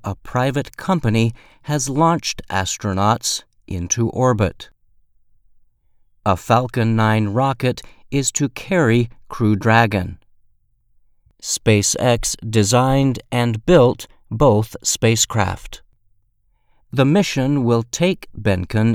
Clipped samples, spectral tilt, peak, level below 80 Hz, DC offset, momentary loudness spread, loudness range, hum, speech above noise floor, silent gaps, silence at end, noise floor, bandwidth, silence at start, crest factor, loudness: under 0.1%; -5 dB/octave; 0 dBFS; -40 dBFS; under 0.1%; 10 LU; 4 LU; none; 44 dB; none; 0 s; -62 dBFS; 16 kHz; 0.05 s; 18 dB; -18 LUFS